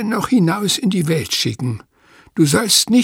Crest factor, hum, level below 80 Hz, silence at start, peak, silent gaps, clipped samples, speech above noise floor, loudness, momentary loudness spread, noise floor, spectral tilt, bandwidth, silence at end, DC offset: 16 dB; none; -52 dBFS; 0 s; 0 dBFS; none; under 0.1%; 34 dB; -16 LUFS; 13 LU; -50 dBFS; -4 dB/octave; 17.5 kHz; 0 s; under 0.1%